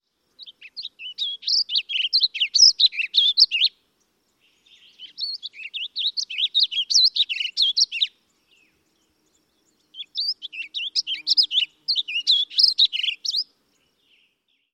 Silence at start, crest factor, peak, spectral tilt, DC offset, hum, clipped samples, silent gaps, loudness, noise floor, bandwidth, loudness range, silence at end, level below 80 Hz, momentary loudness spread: 0.4 s; 20 dB; -4 dBFS; 6 dB/octave; under 0.1%; none; under 0.1%; none; -19 LUFS; -69 dBFS; 15.5 kHz; 8 LU; 1.3 s; -80 dBFS; 16 LU